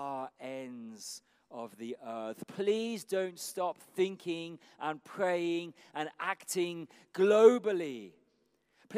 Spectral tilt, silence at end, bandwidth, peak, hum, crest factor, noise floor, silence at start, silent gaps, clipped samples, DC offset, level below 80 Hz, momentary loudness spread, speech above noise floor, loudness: -4.5 dB/octave; 0 s; 15.5 kHz; -10 dBFS; none; 24 dB; -74 dBFS; 0 s; none; under 0.1%; under 0.1%; under -90 dBFS; 18 LU; 42 dB; -33 LUFS